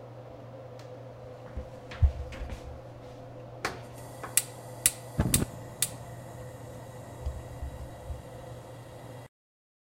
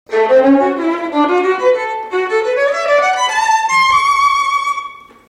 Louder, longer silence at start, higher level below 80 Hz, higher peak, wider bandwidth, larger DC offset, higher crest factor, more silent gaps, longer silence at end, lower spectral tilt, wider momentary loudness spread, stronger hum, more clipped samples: second, -33 LUFS vs -13 LUFS; about the same, 0 s vs 0.1 s; first, -40 dBFS vs -54 dBFS; about the same, 0 dBFS vs -2 dBFS; about the same, 16 kHz vs 15 kHz; neither; first, 34 dB vs 12 dB; neither; first, 0.7 s vs 0.3 s; about the same, -3.5 dB/octave vs -2.5 dB/octave; first, 18 LU vs 7 LU; neither; neither